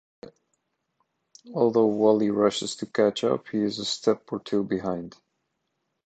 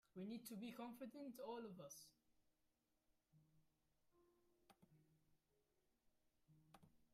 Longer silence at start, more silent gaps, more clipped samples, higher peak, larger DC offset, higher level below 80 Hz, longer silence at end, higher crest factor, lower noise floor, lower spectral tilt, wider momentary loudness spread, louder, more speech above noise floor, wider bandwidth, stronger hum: about the same, 0.25 s vs 0.15 s; neither; neither; first, -6 dBFS vs -42 dBFS; neither; first, -66 dBFS vs under -90 dBFS; first, 1 s vs 0.05 s; about the same, 20 dB vs 18 dB; second, -78 dBFS vs -87 dBFS; about the same, -5 dB/octave vs -5 dB/octave; first, 10 LU vs 7 LU; first, -25 LUFS vs -56 LUFS; first, 54 dB vs 32 dB; second, 9.2 kHz vs 15 kHz; neither